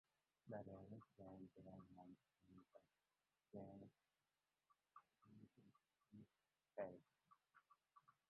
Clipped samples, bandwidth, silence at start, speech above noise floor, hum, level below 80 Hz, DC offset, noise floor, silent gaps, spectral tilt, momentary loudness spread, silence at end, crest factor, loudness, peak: under 0.1%; 4.2 kHz; 0.45 s; over 29 dB; none; -88 dBFS; under 0.1%; under -90 dBFS; none; -8 dB/octave; 13 LU; 0.15 s; 26 dB; -61 LUFS; -38 dBFS